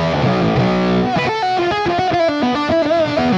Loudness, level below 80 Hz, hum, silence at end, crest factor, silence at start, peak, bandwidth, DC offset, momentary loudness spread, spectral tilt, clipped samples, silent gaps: -16 LUFS; -40 dBFS; none; 0 s; 12 dB; 0 s; -4 dBFS; 8.2 kHz; under 0.1%; 2 LU; -6.5 dB/octave; under 0.1%; none